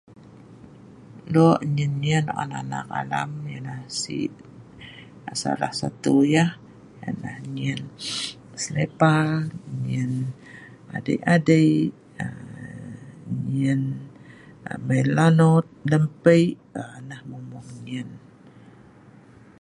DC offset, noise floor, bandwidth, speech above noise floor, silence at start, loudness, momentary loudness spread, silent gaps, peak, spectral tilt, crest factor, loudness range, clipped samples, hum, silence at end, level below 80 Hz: under 0.1%; -49 dBFS; 11.5 kHz; 27 dB; 0.3 s; -23 LUFS; 21 LU; none; -2 dBFS; -6.5 dB/octave; 22 dB; 7 LU; under 0.1%; none; 1 s; -60 dBFS